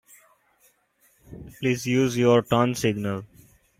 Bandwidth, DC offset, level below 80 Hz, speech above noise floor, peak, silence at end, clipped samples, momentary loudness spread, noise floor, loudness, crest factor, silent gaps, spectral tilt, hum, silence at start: 16 kHz; under 0.1%; -56 dBFS; 42 dB; -6 dBFS; 0.55 s; under 0.1%; 15 LU; -64 dBFS; -23 LUFS; 20 dB; none; -6 dB/octave; none; 1.3 s